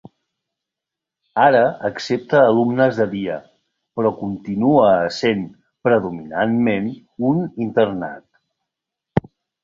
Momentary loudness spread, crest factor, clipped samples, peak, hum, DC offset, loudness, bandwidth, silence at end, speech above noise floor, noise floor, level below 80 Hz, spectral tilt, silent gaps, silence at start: 13 LU; 18 dB; under 0.1%; -2 dBFS; none; under 0.1%; -19 LUFS; 7.6 kHz; 0.45 s; 68 dB; -85 dBFS; -54 dBFS; -7 dB/octave; none; 1.35 s